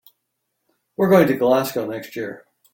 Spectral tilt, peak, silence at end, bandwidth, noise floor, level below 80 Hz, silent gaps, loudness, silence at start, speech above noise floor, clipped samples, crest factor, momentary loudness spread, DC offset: -6.5 dB/octave; -2 dBFS; 0.35 s; 17 kHz; -76 dBFS; -62 dBFS; none; -19 LUFS; 1 s; 57 dB; under 0.1%; 18 dB; 16 LU; under 0.1%